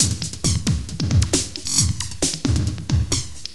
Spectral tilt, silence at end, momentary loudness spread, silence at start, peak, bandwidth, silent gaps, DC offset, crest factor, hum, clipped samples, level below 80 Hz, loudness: -3.5 dB/octave; 0 s; 5 LU; 0 s; -2 dBFS; 15 kHz; none; 1%; 20 dB; none; under 0.1%; -30 dBFS; -21 LUFS